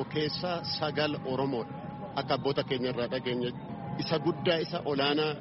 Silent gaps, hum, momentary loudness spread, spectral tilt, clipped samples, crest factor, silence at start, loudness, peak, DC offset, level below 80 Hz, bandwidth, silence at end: none; none; 8 LU; -4 dB/octave; under 0.1%; 18 dB; 0 s; -31 LUFS; -14 dBFS; under 0.1%; -62 dBFS; 6 kHz; 0 s